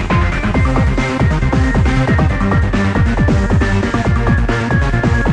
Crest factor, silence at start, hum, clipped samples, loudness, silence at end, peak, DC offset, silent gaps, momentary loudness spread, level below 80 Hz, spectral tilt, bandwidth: 12 dB; 0 s; none; under 0.1%; -14 LUFS; 0 s; -2 dBFS; under 0.1%; none; 2 LU; -18 dBFS; -7 dB/octave; 10 kHz